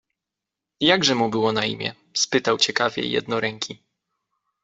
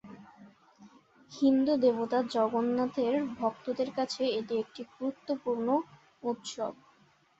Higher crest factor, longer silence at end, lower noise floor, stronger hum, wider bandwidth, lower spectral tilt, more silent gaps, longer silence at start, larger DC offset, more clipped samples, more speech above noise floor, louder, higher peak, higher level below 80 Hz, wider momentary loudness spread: about the same, 22 dB vs 18 dB; first, 0.9 s vs 0.65 s; first, -86 dBFS vs -65 dBFS; neither; about the same, 8.2 kHz vs 8 kHz; second, -3 dB/octave vs -5 dB/octave; neither; first, 0.8 s vs 0.05 s; neither; neither; first, 64 dB vs 35 dB; first, -21 LUFS vs -31 LUFS; first, -2 dBFS vs -14 dBFS; first, -62 dBFS vs -74 dBFS; second, 9 LU vs 12 LU